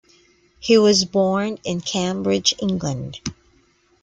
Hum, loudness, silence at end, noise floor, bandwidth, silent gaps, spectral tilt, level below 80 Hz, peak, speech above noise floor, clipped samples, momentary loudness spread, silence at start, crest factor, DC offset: none; -19 LUFS; 0.7 s; -59 dBFS; 9.4 kHz; none; -4 dB/octave; -54 dBFS; -2 dBFS; 40 dB; under 0.1%; 16 LU; 0.6 s; 20 dB; under 0.1%